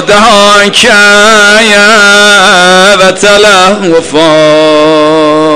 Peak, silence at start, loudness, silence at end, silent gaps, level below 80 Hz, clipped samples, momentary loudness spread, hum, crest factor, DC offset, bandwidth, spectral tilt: 0 dBFS; 0 s; -2 LUFS; 0 s; none; -38 dBFS; 10%; 4 LU; none; 4 dB; under 0.1%; 16 kHz; -2.5 dB/octave